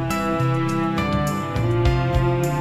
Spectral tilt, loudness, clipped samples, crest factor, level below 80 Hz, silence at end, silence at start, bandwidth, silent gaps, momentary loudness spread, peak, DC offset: -7 dB/octave; -21 LUFS; under 0.1%; 14 dB; -30 dBFS; 0 s; 0 s; 14 kHz; none; 3 LU; -6 dBFS; under 0.1%